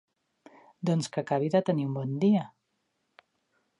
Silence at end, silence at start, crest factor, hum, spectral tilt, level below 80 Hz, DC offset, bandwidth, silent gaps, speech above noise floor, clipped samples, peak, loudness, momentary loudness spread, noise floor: 1.35 s; 0.8 s; 18 dB; none; -7 dB/octave; -78 dBFS; under 0.1%; 11 kHz; none; 51 dB; under 0.1%; -12 dBFS; -28 LUFS; 7 LU; -78 dBFS